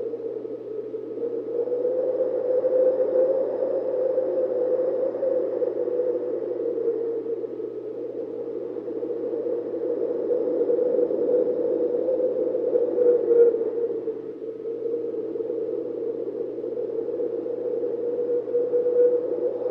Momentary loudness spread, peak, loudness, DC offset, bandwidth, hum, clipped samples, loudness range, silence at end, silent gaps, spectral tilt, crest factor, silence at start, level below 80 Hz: 11 LU; -8 dBFS; -25 LUFS; under 0.1%; 2.9 kHz; none; under 0.1%; 7 LU; 0 s; none; -9.5 dB/octave; 16 dB; 0 s; -76 dBFS